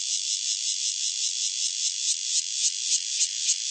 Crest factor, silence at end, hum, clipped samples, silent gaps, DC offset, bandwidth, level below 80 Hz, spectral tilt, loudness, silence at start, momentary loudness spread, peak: 18 dB; 0 s; none; under 0.1%; none; under 0.1%; 8.8 kHz; under -90 dBFS; 14.5 dB/octave; -24 LUFS; 0 s; 2 LU; -8 dBFS